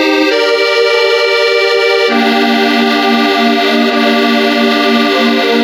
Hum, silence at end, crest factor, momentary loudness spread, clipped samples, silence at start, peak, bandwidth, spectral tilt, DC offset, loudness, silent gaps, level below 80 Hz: none; 0 s; 10 dB; 1 LU; under 0.1%; 0 s; 0 dBFS; 16.5 kHz; -3.5 dB/octave; under 0.1%; -9 LUFS; none; -58 dBFS